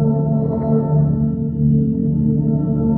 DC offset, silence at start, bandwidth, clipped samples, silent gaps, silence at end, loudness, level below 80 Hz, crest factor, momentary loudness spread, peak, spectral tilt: under 0.1%; 0 s; 1.9 kHz; under 0.1%; none; 0 s; -17 LUFS; -36 dBFS; 10 dB; 3 LU; -6 dBFS; -15.5 dB/octave